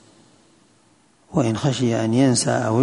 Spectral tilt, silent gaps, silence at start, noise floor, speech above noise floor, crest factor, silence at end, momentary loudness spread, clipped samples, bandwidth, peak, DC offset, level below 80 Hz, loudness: -5.5 dB/octave; none; 1.3 s; -58 dBFS; 39 dB; 16 dB; 0 s; 5 LU; under 0.1%; 11 kHz; -4 dBFS; under 0.1%; -54 dBFS; -20 LUFS